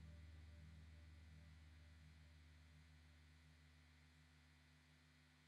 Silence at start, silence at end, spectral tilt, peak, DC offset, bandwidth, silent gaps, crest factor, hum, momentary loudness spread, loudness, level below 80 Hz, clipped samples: 0 s; 0 s; -5.5 dB/octave; -52 dBFS; under 0.1%; 11 kHz; none; 14 dB; none; 6 LU; -66 LUFS; -68 dBFS; under 0.1%